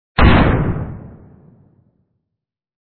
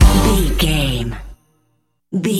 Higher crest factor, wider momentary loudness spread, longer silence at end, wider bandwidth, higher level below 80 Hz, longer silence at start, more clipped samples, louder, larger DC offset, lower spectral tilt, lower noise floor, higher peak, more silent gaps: about the same, 18 dB vs 16 dB; first, 19 LU vs 13 LU; first, 1.8 s vs 0 s; second, 4.5 kHz vs 16 kHz; second, -24 dBFS vs -18 dBFS; first, 0.2 s vs 0 s; neither; first, -14 LUFS vs -17 LUFS; neither; first, -10.5 dB/octave vs -5 dB/octave; first, -80 dBFS vs -65 dBFS; about the same, 0 dBFS vs 0 dBFS; neither